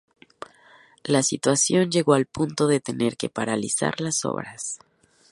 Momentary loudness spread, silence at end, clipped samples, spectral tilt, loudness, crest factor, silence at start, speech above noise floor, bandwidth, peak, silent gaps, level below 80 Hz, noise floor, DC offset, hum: 18 LU; 0.55 s; under 0.1%; -4 dB/octave; -23 LUFS; 22 dB; 1.05 s; 31 dB; 11.5 kHz; -4 dBFS; none; -62 dBFS; -54 dBFS; under 0.1%; none